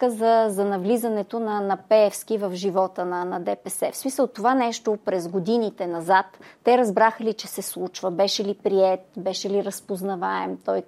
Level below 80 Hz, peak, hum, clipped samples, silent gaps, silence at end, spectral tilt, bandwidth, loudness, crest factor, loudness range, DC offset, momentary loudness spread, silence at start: -78 dBFS; -6 dBFS; none; under 0.1%; none; 0.05 s; -4.5 dB/octave; 15.5 kHz; -23 LUFS; 18 dB; 3 LU; under 0.1%; 9 LU; 0 s